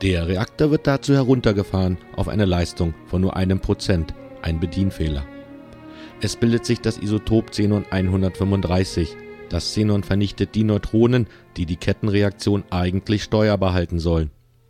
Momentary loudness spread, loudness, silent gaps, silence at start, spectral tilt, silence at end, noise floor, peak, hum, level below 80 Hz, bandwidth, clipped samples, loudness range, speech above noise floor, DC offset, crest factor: 11 LU; -21 LUFS; none; 0 s; -7 dB/octave; 0.4 s; -40 dBFS; -2 dBFS; none; -36 dBFS; 13 kHz; under 0.1%; 4 LU; 20 dB; under 0.1%; 18 dB